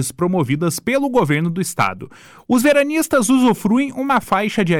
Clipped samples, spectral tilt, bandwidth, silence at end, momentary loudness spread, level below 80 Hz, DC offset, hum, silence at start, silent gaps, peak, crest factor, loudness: under 0.1%; -5 dB/octave; 18 kHz; 0 s; 5 LU; -52 dBFS; under 0.1%; none; 0 s; none; -6 dBFS; 12 dB; -17 LUFS